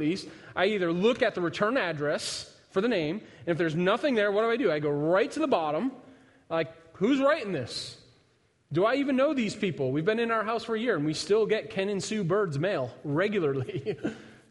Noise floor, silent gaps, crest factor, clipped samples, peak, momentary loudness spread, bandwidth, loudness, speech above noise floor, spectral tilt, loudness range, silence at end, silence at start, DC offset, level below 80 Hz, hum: -67 dBFS; none; 18 dB; under 0.1%; -10 dBFS; 9 LU; 11.5 kHz; -28 LUFS; 39 dB; -5.5 dB/octave; 2 LU; 0.15 s; 0 s; under 0.1%; -68 dBFS; none